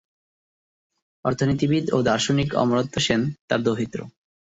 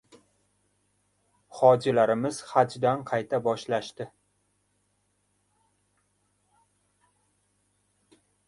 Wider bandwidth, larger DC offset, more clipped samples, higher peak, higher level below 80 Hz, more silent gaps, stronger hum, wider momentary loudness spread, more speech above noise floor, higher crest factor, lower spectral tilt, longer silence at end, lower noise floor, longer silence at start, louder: second, 8 kHz vs 11.5 kHz; neither; neither; about the same, -6 dBFS vs -6 dBFS; first, -52 dBFS vs -72 dBFS; first, 3.41-3.48 s vs none; second, none vs 50 Hz at -65 dBFS; second, 7 LU vs 18 LU; first, over 68 dB vs 48 dB; second, 18 dB vs 24 dB; about the same, -5.5 dB/octave vs -6 dB/octave; second, 0.3 s vs 4.4 s; first, under -90 dBFS vs -73 dBFS; second, 1.25 s vs 1.55 s; about the same, -23 LUFS vs -25 LUFS